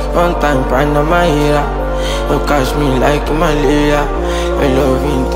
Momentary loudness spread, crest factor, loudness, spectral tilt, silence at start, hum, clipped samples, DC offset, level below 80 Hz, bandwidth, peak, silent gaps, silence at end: 5 LU; 12 dB; -13 LUFS; -6 dB/octave; 0 s; none; under 0.1%; under 0.1%; -18 dBFS; 16 kHz; 0 dBFS; none; 0 s